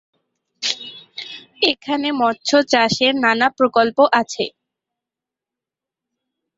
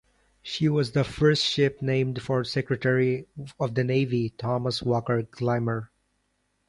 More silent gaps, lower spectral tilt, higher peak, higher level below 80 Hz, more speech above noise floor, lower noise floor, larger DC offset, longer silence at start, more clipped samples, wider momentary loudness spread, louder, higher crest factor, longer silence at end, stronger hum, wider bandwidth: neither; second, -3 dB/octave vs -6.5 dB/octave; first, 0 dBFS vs -8 dBFS; second, -62 dBFS vs -56 dBFS; first, 70 dB vs 48 dB; first, -87 dBFS vs -73 dBFS; neither; first, 0.6 s vs 0.45 s; neither; first, 17 LU vs 8 LU; first, -17 LUFS vs -26 LUFS; about the same, 20 dB vs 18 dB; first, 2.1 s vs 0.8 s; neither; second, 8 kHz vs 11.5 kHz